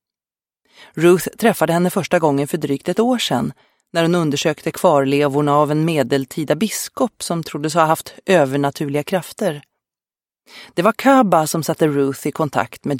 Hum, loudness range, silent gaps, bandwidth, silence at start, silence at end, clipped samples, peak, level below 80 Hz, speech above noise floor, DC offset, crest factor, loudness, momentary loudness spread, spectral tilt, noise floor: none; 2 LU; none; 17 kHz; 0.95 s; 0 s; under 0.1%; 0 dBFS; -60 dBFS; over 73 dB; under 0.1%; 18 dB; -18 LUFS; 8 LU; -5.5 dB/octave; under -90 dBFS